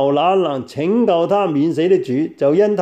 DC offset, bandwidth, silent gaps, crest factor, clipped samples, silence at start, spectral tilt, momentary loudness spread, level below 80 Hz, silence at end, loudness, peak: under 0.1%; 9 kHz; none; 12 dB; under 0.1%; 0 s; -7.5 dB/octave; 5 LU; -64 dBFS; 0 s; -16 LUFS; -4 dBFS